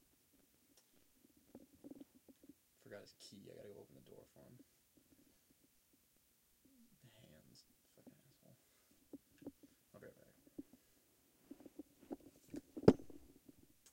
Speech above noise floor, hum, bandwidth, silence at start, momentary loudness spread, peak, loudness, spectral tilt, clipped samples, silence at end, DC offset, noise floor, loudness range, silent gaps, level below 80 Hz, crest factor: 15 dB; none; 16.5 kHz; 1.55 s; 19 LU; -10 dBFS; -39 LUFS; -7.5 dB/octave; under 0.1%; 0.75 s; under 0.1%; -76 dBFS; 26 LU; none; -74 dBFS; 40 dB